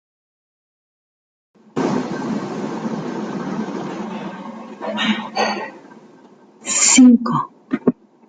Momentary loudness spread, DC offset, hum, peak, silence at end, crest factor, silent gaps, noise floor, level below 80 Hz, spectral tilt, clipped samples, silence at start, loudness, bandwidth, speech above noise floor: 19 LU; under 0.1%; none; 0 dBFS; 0.35 s; 20 dB; none; -47 dBFS; -64 dBFS; -3 dB/octave; under 0.1%; 1.75 s; -18 LUFS; 9.6 kHz; 33 dB